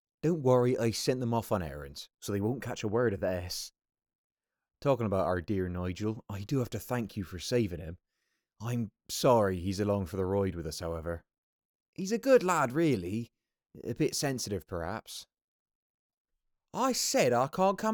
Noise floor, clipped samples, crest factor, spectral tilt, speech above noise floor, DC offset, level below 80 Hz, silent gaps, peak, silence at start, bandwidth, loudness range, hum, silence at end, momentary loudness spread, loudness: -82 dBFS; under 0.1%; 20 dB; -5 dB/octave; 52 dB; under 0.1%; -60 dBFS; 4.15-4.30 s, 11.38-11.59 s, 11.65-11.93 s, 15.44-15.66 s, 15.75-16.25 s; -12 dBFS; 0.25 s; over 20 kHz; 5 LU; none; 0 s; 15 LU; -31 LUFS